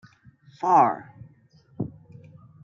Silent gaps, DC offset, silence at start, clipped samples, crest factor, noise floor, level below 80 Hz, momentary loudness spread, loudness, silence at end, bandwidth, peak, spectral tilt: none; under 0.1%; 0.6 s; under 0.1%; 22 dB; -57 dBFS; -66 dBFS; 16 LU; -24 LUFS; 0.75 s; 7.2 kHz; -6 dBFS; -7.5 dB/octave